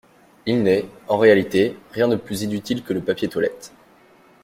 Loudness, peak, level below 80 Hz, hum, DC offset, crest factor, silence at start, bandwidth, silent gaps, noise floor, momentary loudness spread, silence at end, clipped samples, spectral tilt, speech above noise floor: -21 LUFS; -2 dBFS; -58 dBFS; none; under 0.1%; 18 dB; 0.45 s; 16.5 kHz; none; -52 dBFS; 11 LU; 0.75 s; under 0.1%; -6 dB/octave; 32 dB